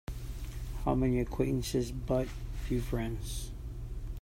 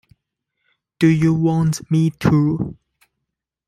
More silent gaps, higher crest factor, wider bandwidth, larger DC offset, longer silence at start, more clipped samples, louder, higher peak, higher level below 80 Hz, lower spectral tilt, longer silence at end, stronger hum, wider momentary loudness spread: neither; about the same, 18 dB vs 16 dB; first, 16 kHz vs 13 kHz; neither; second, 0.1 s vs 1 s; neither; second, -35 LUFS vs -18 LUFS; second, -16 dBFS vs -2 dBFS; first, -40 dBFS vs -48 dBFS; about the same, -6.5 dB/octave vs -7.5 dB/octave; second, 0 s vs 0.95 s; neither; first, 12 LU vs 6 LU